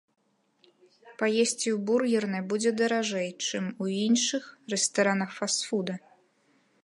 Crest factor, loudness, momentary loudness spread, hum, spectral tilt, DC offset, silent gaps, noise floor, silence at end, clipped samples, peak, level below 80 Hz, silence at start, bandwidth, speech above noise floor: 18 dB; -28 LUFS; 7 LU; none; -3.5 dB/octave; under 0.1%; none; -67 dBFS; 0.85 s; under 0.1%; -12 dBFS; -80 dBFS; 1.05 s; 11.5 kHz; 40 dB